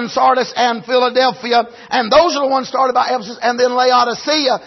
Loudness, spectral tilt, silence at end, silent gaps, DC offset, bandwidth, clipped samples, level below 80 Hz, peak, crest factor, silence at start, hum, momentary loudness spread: -14 LUFS; -3 dB/octave; 0 s; none; under 0.1%; 6.2 kHz; under 0.1%; -54 dBFS; -2 dBFS; 14 dB; 0 s; none; 6 LU